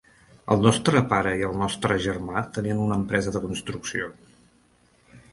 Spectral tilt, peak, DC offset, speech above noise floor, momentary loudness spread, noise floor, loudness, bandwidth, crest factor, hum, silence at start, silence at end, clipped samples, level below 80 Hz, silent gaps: -5.5 dB/octave; -2 dBFS; under 0.1%; 37 dB; 11 LU; -61 dBFS; -24 LUFS; 11.5 kHz; 24 dB; none; 0.45 s; 0.15 s; under 0.1%; -48 dBFS; none